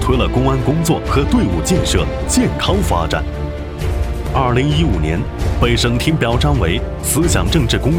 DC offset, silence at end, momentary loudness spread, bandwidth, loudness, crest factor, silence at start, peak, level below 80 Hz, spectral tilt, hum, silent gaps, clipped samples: under 0.1%; 0 s; 6 LU; 17 kHz; -16 LUFS; 14 dB; 0 s; 0 dBFS; -22 dBFS; -5 dB/octave; none; none; under 0.1%